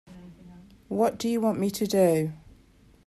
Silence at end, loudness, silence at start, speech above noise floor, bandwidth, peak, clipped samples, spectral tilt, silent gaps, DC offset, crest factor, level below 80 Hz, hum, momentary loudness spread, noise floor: 0.7 s; -26 LUFS; 0.1 s; 32 dB; 14 kHz; -10 dBFS; under 0.1%; -6 dB/octave; none; under 0.1%; 18 dB; -60 dBFS; none; 8 LU; -57 dBFS